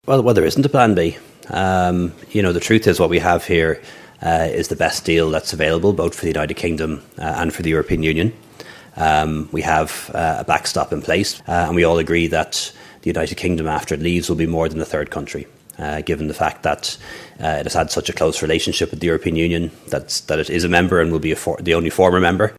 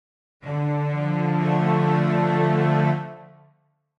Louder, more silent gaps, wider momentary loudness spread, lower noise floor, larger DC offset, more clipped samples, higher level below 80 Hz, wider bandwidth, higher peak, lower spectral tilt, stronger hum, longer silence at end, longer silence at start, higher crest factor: first, -18 LUFS vs -22 LUFS; neither; about the same, 11 LU vs 9 LU; second, -40 dBFS vs -64 dBFS; neither; neither; first, -36 dBFS vs -64 dBFS; first, 16 kHz vs 6.2 kHz; first, 0 dBFS vs -8 dBFS; second, -5 dB/octave vs -9 dB/octave; neither; second, 0 s vs 0.75 s; second, 0.05 s vs 0.45 s; about the same, 18 dB vs 16 dB